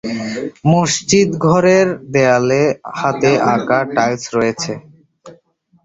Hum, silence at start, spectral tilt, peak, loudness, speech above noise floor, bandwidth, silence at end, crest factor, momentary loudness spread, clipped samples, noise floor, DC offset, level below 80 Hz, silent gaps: none; 0.05 s; -5 dB/octave; 0 dBFS; -15 LUFS; 40 dB; 8 kHz; 0.5 s; 16 dB; 10 LU; under 0.1%; -54 dBFS; under 0.1%; -52 dBFS; none